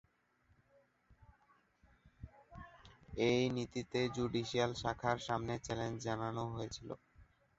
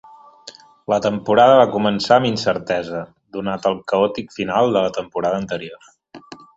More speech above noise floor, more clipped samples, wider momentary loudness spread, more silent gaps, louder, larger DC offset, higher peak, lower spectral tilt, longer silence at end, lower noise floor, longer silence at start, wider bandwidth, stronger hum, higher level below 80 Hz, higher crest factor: first, 37 dB vs 26 dB; neither; first, 21 LU vs 16 LU; neither; second, -38 LUFS vs -18 LUFS; neither; second, -18 dBFS vs 0 dBFS; about the same, -4.5 dB/octave vs -5.5 dB/octave; first, 0.35 s vs 0.2 s; first, -75 dBFS vs -43 dBFS; first, 1.1 s vs 0.45 s; about the same, 8 kHz vs 8 kHz; neither; second, -62 dBFS vs -56 dBFS; about the same, 22 dB vs 18 dB